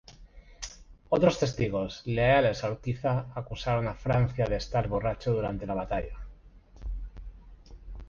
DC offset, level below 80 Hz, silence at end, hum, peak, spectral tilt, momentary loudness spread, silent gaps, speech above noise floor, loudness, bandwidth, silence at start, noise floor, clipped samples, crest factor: under 0.1%; -42 dBFS; 0 s; none; -8 dBFS; -6.5 dB/octave; 18 LU; none; 24 dB; -29 LUFS; 7.4 kHz; 0.1 s; -52 dBFS; under 0.1%; 22 dB